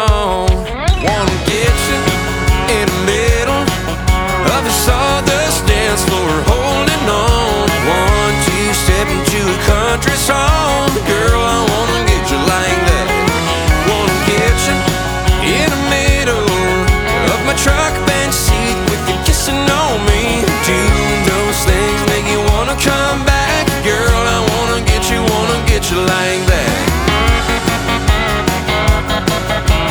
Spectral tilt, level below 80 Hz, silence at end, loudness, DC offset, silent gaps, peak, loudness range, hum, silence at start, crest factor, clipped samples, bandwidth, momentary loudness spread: -4 dB/octave; -18 dBFS; 0 s; -13 LUFS; under 0.1%; none; 0 dBFS; 1 LU; none; 0 s; 12 dB; under 0.1%; over 20 kHz; 2 LU